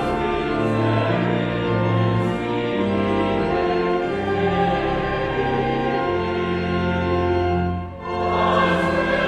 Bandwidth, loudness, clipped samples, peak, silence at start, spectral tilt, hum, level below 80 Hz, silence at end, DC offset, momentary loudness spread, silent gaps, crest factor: 10 kHz; -21 LUFS; under 0.1%; -6 dBFS; 0 s; -7.5 dB/octave; none; -40 dBFS; 0 s; under 0.1%; 4 LU; none; 14 dB